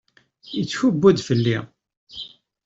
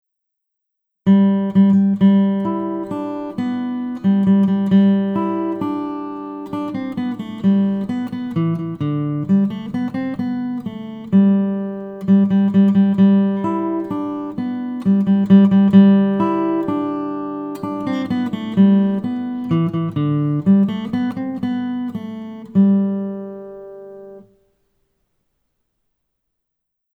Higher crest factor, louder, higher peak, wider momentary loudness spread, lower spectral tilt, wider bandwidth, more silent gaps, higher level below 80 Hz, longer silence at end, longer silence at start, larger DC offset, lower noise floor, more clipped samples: about the same, 20 dB vs 18 dB; about the same, -20 LUFS vs -18 LUFS; second, -4 dBFS vs 0 dBFS; first, 19 LU vs 13 LU; second, -6.5 dB/octave vs -10 dB/octave; first, 7.8 kHz vs 4.4 kHz; first, 1.97-2.07 s vs none; about the same, -58 dBFS vs -60 dBFS; second, 0.4 s vs 2.75 s; second, 0.45 s vs 1.05 s; neither; second, -40 dBFS vs -78 dBFS; neither